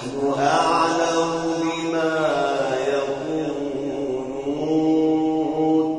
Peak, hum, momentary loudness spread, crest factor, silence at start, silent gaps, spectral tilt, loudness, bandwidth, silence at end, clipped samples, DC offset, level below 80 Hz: -6 dBFS; none; 7 LU; 16 dB; 0 s; none; -5 dB/octave; -22 LUFS; 10.5 kHz; 0 s; under 0.1%; under 0.1%; -56 dBFS